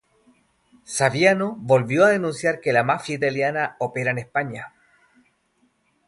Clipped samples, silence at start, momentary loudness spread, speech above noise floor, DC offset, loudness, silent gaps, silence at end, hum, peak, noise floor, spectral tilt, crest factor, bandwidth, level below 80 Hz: under 0.1%; 0.9 s; 9 LU; 45 dB; under 0.1%; -21 LUFS; none; 1.4 s; none; -2 dBFS; -66 dBFS; -5 dB/octave; 22 dB; 11.5 kHz; -64 dBFS